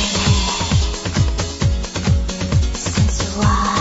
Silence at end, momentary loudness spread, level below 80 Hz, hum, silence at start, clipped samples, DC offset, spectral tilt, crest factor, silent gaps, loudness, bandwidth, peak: 0 s; 4 LU; -22 dBFS; none; 0 s; under 0.1%; under 0.1%; -4.5 dB/octave; 14 dB; none; -18 LUFS; 8 kHz; -4 dBFS